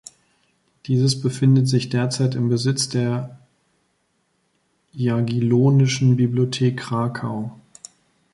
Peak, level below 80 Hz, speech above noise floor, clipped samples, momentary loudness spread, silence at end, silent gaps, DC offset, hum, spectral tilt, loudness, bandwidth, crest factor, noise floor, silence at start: -6 dBFS; -58 dBFS; 49 dB; under 0.1%; 12 LU; 0.8 s; none; under 0.1%; none; -6 dB/octave; -20 LUFS; 11.5 kHz; 16 dB; -68 dBFS; 0.85 s